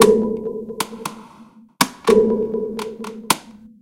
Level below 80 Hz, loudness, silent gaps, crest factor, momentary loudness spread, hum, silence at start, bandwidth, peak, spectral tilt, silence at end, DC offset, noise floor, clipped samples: -52 dBFS; -20 LUFS; none; 20 dB; 16 LU; none; 0 s; 17 kHz; 0 dBFS; -4 dB/octave; 0.15 s; under 0.1%; -46 dBFS; under 0.1%